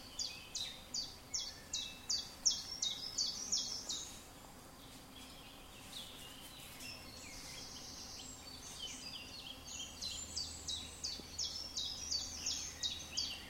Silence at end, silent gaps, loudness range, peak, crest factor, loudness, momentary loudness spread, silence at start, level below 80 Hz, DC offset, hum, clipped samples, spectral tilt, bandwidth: 0 s; none; 11 LU; -16 dBFS; 28 dB; -41 LUFS; 16 LU; 0 s; -62 dBFS; under 0.1%; none; under 0.1%; -0.5 dB/octave; 16 kHz